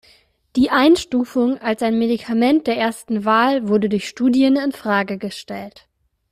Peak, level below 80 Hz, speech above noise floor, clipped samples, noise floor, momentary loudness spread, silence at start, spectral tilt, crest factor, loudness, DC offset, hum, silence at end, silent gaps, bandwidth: -2 dBFS; -54 dBFS; 37 dB; under 0.1%; -55 dBFS; 12 LU; 0.55 s; -5.5 dB/octave; 16 dB; -18 LUFS; under 0.1%; none; 0.6 s; none; 15 kHz